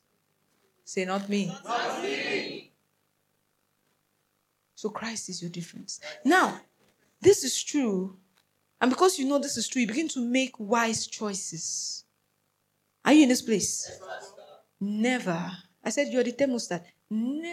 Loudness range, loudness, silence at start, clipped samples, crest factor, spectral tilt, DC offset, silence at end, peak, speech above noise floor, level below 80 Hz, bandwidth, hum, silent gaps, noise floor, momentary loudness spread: 10 LU; -27 LUFS; 0.85 s; under 0.1%; 22 dB; -3.5 dB/octave; under 0.1%; 0 s; -8 dBFS; 48 dB; -70 dBFS; 15 kHz; 50 Hz at -65 dBFS; none; -75 dBFS; 15 LU